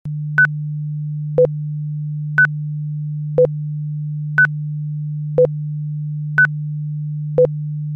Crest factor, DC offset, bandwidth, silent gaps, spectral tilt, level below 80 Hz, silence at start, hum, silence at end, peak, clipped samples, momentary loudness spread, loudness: 14 dB; under 0.1%; 3.6 kHz; none; -10 dB/octave; -54 dBFS; 0.05 s; none; 0 s; -4 dBFS; under 0.1%; 9 LU; -19 LUFS